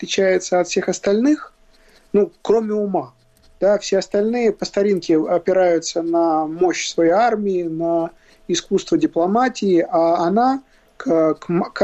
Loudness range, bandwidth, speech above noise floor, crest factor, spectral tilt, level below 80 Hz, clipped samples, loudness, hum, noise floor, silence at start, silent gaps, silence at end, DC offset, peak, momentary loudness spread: 2 LU; 8.4 kHz; 34 dB; 14 dB; -5 dB/octave; -56 dBFS; under 0.1%; -18 LUFS; none; -51 dBFS; 0 s; none; 0 s; under 0.1%; -4 dBFS; 6 LU